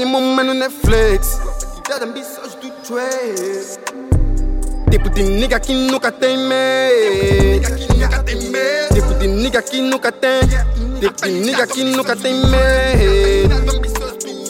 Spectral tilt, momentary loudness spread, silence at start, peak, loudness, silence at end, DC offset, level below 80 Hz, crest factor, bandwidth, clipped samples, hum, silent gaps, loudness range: -5 dB/octave; 11 LU; 0 s; -2 dBFS; -16 LUFS; 0 s; under 0.1%; -18 dBFS; 12 dB; 17 kHz; under 0.1%; none; none; 6 LU